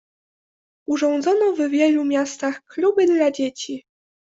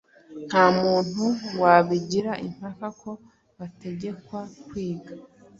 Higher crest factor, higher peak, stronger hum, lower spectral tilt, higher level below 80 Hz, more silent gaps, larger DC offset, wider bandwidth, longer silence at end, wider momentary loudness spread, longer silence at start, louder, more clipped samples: second, 14 dB vs 22 dB; second, -6 dBFS vs -2 dBFS; neither; second, -3.5 dB/octave vs -6 dB/octave; second, -68 dBFS vs -62 dBFS; neither; neither; about the same, 8 kHz vs 7.8 kHz; first, 0.5 s vs 0.35 s; second, 13 LU vs 23 LU; first, 0.9 s vs 0.3 s; first, -20 LUFS vs -23 LUFS; neither